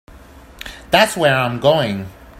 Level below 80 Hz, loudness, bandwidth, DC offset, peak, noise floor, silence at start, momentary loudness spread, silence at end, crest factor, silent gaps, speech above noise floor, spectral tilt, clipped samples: -44 dBFS; -15 LUFS; 16 kHz; under 0.1%; 0 dBFS; -41 dBFS; 0.15 s; 20 LU; 0 s; 18 dB; none; 26 dB; -4.5 dB/octave; under 0.1%